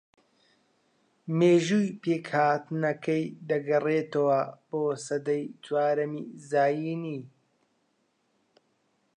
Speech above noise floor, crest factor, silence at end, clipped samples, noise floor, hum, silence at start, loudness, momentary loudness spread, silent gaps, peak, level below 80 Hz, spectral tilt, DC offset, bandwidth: 46 dB; 18 dB; 1.9 s; under 0.1%; -73 dBFS; none; 1.25 s; -27 LUFS; 10 LU; none; -10 dBFS; -82 dBFS; -6.5 dB/octave; under 0.1%; 10.5 kHz